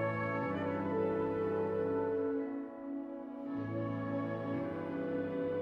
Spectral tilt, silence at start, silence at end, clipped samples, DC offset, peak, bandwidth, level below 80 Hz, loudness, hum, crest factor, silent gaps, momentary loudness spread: -9.5 dB/octave; 0 s; 0 s; under 0.1%; under 0.1%; -24 dBFS; 5.4 kHz; -68 dBFS; -37 LUFS; none; 12 dB; none; 8 LU